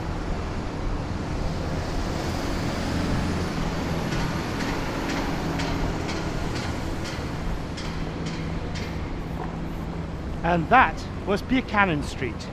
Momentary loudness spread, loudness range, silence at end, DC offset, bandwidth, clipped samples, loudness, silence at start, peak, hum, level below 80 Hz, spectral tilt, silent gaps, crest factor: 10 LU; 7 LU; 0 s; under 0.1%; 15.5 kHz; under 0.1%; -27 LUFS; 0 s; -2 dBFS; none; -34 dBFS; -5.5 dB/octave; none; 24 dB